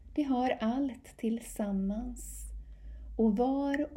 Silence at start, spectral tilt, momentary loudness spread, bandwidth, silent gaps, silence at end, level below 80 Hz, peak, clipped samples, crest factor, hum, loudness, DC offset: 0 s; -6 dB/octave; 17 LU; 16 kHz; none; 0 s; -48 dBFS; -18 dBFS; under 0.1%; 14 dB; none; -33 LUFS; under 0.1%